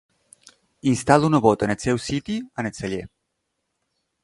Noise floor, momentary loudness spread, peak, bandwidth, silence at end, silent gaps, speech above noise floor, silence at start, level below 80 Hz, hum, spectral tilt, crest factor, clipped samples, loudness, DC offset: -77 dBFS; 13 LU; 0 dBFS; 11.5 kHz; 1.15 s; none; 56 dB; 0.85 s; -50 dBFS; none; -6 dB/octave; 24 dB; under 0.1%; -22 LUFS; under 0.1%